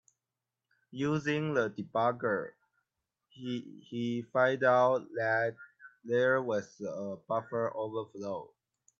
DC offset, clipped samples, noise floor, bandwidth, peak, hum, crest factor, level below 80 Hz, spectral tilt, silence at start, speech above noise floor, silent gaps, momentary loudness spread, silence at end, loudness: under 0.1%; under 0.1%; -90 dBFS; 7.6 kHz; -12 dBFS; none; 20 dB; -78 dBFS; -6.5 dB/octave; 0.95 s; 58 dB; none; 14 LU; 0.55 s; -32 LUFS